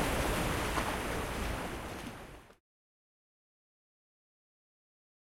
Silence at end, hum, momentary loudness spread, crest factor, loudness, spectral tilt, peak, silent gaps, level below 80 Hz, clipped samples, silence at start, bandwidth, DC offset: 2.85 s; none; 16 LU; 22 dB; -36 LUFS; -4 dB/octave; -18 dBFS; none; -46 dBFS; under 0.1%; 0 s; 16.5 kHz; under 0.1%